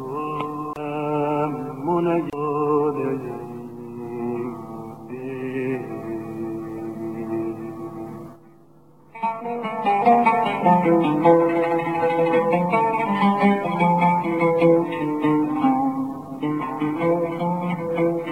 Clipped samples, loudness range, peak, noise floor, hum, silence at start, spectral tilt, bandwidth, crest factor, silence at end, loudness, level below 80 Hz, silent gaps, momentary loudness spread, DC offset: under 0.1%; 11 LU; -4 dBFS; -52 dBFS; none; 0 s; -8.5 dB/octave; 15.5 kHz; 18 dB; 0 s; -22 LUFS; -62 dBFS; none; 15 LU; 0.2%